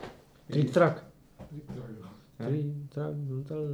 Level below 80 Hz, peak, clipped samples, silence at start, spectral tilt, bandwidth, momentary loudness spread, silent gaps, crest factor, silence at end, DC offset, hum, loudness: -62 dBFS; -10 dBFS; under 0.1%; 0 s; -8 dB/octave; 11 kHz; 22 LU; none; 22 dB; 0 s; under 0.1%; none; -31 LUFS